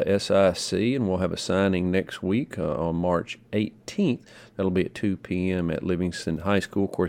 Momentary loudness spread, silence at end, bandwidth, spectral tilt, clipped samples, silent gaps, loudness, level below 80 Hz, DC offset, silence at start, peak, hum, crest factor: 7 LU; 0 s; 13.5 kHz; -6 dB/octave; under 0.1%; none; -26 LUFS; -52 dBFS; under 0.1%; 0 s; -6 dBFS; none; 18 dB